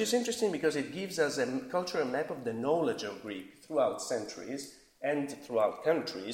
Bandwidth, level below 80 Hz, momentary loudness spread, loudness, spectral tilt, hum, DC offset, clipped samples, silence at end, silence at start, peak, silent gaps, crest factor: 16.5 kHz; -74 dBFS; 10 LU; -33 LUFS; -4 dB/octave; none; under 0.1%; under 0.1%; 0 s; 0 s; -16 dBFS; none; 16 dB